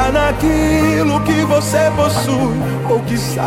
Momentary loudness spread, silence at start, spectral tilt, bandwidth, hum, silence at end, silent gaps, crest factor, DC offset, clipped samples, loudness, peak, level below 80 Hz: 4 LU; 0 s; -5.5 dB/octave; 16.5 kHz; none; 0 s; none; 12 dB; under 0.1%; under 0.1%; -15 LUFS; -2 dBFS; -28 dBFS